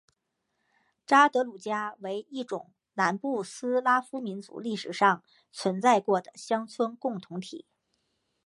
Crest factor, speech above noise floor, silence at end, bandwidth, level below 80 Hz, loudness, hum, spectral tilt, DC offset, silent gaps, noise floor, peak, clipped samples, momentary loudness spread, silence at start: 22 dB; 52 dB; 0.9 s; 11.5 kHz; -84 dBFS; -28 LUFS; none; -4.5 dB/octave; under 0.1%; none; -80 dBFS; -6 dBFS; under 0.1%; 14 LU; 1.1 s